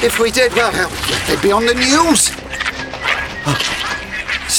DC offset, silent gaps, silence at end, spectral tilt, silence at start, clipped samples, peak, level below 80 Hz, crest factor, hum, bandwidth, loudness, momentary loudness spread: under 0.1%; none; 0 s; -2.5 dB/octave; 0 s; under 0.1%; -2 dBFS; -36 dBFS; 14 dB; none; 19.5 kHz; -15 LUFS; 9 LU